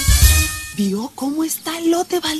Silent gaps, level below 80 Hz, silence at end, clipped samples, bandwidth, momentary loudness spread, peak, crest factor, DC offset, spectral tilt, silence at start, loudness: none; -22 dBFS; 0 s; under 0.1%; 13.5 kHz; 10 LU; -2 dBFS; 16 dB; under 0.1%; -4 dB/octave; 0 s; -18 LUFS